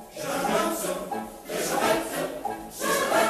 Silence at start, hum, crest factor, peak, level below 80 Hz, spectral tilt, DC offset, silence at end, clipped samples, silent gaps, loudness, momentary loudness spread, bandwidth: 0 s; none; 18 dB; -10 dBFS; -56 dBFS; -3 dB/octave; under 0.1%; 0 s; under 0.1%; none; -28 LUFS; 10 LU; 14 kHz